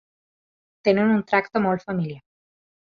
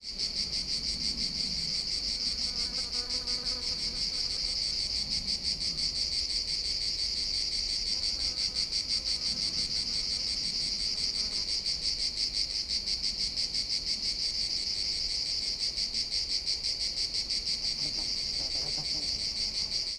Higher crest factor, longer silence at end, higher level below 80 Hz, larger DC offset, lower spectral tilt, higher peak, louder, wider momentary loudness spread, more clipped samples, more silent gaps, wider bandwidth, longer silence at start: about the same, 20 dB vs 18 dB; first, 0.7 s vs 0 s; second, -64 dBFS vs -48 dBFS; neither; first, -8 dB/octave vs -0.5 dB/octave; first, -4 dBFS vs -16 dBFS; first, -22 LUFS vs -29 LUFS; first, 10 LU vs 1 LU; neither; neither; second, 6.6 kHz vs 12 kHz; first, 0.85 s vs 0 s